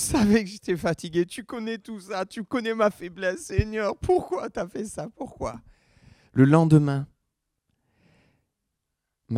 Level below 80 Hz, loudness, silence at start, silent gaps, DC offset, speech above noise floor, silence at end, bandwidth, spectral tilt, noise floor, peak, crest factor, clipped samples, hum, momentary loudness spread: -46 dBFS; -25 LUFS; 0 s; none; under 0.1%; 57 dB; 0 s; 15.5 kHz; -6.5 dB/octave; -82 dBFS; -4 dBFS; 22 dB; under 0.1%; none; 16 LU